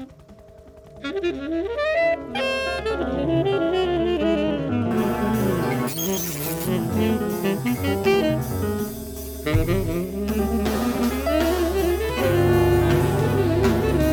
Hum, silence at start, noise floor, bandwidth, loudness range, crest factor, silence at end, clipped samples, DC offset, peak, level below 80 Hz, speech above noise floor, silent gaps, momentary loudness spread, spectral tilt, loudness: none; 0 s; -46 dBFS; over 20 kHz; 3 LU; 14 dB; 0 s; under 0.1%; under 0.1%; -8 dBFS; -34 dBFS; 24 dB; none; 6 LU; -6 dB/octave; -22 LUFS